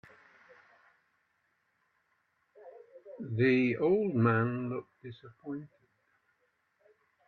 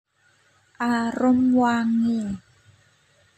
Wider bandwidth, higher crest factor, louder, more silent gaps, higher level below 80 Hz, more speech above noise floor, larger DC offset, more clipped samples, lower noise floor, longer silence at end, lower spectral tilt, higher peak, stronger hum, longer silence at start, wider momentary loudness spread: second, 6 kHz vs 8.6 kHz; first, 20 dB vs 14 dB; second, -30 LUFS vs -22 LUFS; neither; second, -76 dBFS vs -60 dBFS; first, 46 dB vs 42 dB; neither; neither; first, -76 dBFS vs -62 dBFS; first, 1.6 s vs 1 s; first, -9.5 dB/octave vs -6 dB/octave; second, -14 dBFS vs -10 dBFS; neither; first, 2.65 s vs 0.8 s; first, 22 LU vs 11 LU